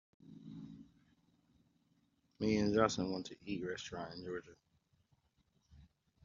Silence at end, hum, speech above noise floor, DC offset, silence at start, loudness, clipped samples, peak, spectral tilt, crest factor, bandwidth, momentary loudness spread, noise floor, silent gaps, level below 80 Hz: 0.4 s; none; 40 dB; under 0.1%; 0.25 s; -38 LUFS; under 0.1%; -16 dBFS; -5 dB/octave; 26 dB; 7.4 kHz; 21 LU; -77 dBFS; none; -68 dBFS